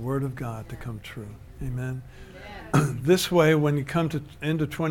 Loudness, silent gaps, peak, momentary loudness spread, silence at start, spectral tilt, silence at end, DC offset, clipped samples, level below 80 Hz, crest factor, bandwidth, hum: -25 LUFS; none; -8 dBFS; 21 LU; 0 s; -6 dB/octave; 0 s; under 0.1%; under 0.1%; -46 dBFS; 18 dB; 17.5 kHz; none